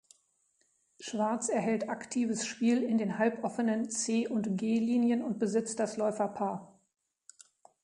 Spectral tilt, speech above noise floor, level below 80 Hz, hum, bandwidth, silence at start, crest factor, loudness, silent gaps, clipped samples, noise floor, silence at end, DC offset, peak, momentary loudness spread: -5 dB/octave; 43 dB; -78 dBFS; none; 11 kHz; 1 s; 16 dB; -31 LUFS; none; under 0.1%; -74 dBFS; 1.15 s; under 0.1%; -16 dBFS; 6 LU